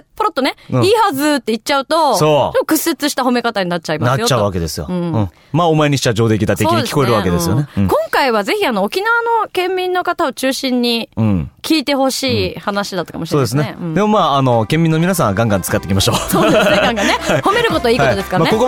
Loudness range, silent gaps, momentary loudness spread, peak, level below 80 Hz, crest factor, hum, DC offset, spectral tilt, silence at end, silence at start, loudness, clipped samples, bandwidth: 3 LU; none; 6 LU; -2 dBFS; -40 dBFS; 12 dB; none; under 0.1%; -5 dB/octave; 0 s; 0.15 s; -15 LUFS; under 0.1%; 19 kHz